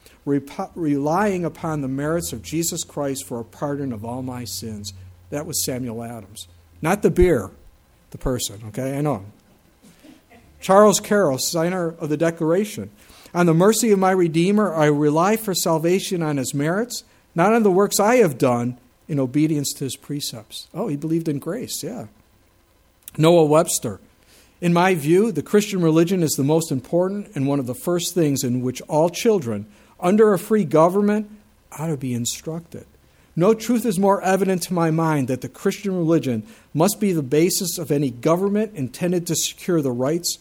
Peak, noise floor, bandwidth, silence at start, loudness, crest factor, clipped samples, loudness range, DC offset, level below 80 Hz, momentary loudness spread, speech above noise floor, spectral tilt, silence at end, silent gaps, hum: 0 dBFS; -58 dBFS; 18 kHz; 0.25 s; -20 LUFS; 20 dB; under 0.1%; 7 LU; under 0.1%; -46 dBFS; 13 LU; 38 dB; -5 dB/octave; 0.05 s; none; none